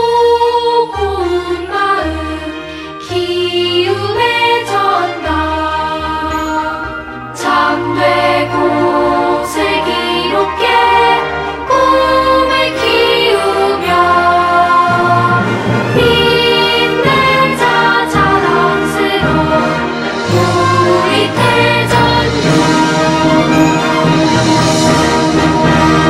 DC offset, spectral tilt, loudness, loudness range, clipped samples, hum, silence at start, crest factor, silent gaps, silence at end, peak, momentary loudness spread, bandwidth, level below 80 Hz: under 0.1%; -5 dB/octave; -11 LUFS; 4 LU; under 0.1%; none; 0 s; 12 dB; none; 0 s; 0 dBFS; 7 LU; 15.5 kHz; -36 dBFS